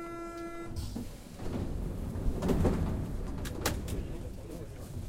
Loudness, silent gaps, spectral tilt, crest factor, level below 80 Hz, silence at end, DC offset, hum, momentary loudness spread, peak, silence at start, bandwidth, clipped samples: -37 LUFS; none; -6 dB/octave; 20 dB; -40 dBFS; 0 s; under 0.1%; none; 13 LU; -14 dBFS; 0 s; 16 kHz; under 0.1%